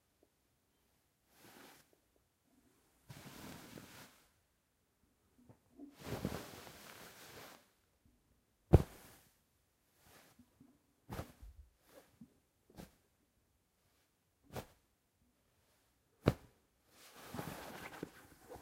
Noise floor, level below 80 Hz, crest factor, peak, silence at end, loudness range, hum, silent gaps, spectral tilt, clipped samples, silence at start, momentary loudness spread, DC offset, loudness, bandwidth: -80 dBFS; -56 dBFS; 36 dB; -10 dBFS; 0 s; 19 LU; none; none; -7 dB/octave; under 0.1%; 1.45 s; 25 LU; under 0.1%; -42 LUFS; 16 kHz